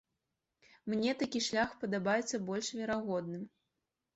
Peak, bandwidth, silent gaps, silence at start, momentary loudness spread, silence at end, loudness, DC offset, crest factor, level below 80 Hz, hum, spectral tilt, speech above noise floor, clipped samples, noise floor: -20 dBFS; 8.2 kHz; none; 0.85 s; 11 LU; 0.65 s; -35 LUFS; under 0.1%; 18 dB; -72 dBFS; none; -4 dB/octave; 52 dB; under 0.1%; -87 dBFS